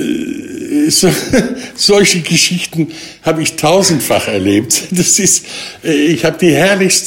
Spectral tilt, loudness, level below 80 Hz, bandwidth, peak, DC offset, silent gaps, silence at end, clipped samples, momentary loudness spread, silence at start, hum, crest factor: -3 dB/octave; -11 LUFS; -44 dBFS; 16.5 kHz; 0 dBFS; under 0.1%; none; 0 s; under 0.1%; 11 LU; 0 s; none; 12 dB